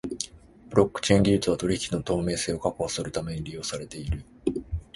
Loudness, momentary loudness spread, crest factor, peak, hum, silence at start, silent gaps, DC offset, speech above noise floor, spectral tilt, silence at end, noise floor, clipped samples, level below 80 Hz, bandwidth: -27 LUFS; 12 LU; 22 dB; -6 dBFS; none; 0.05 s; none; under 0.1%; 22 dB; -5 dB/octave; 0.15 s; -48 dBFS; under 0.1%; -42 dBFS; 11.5 kHz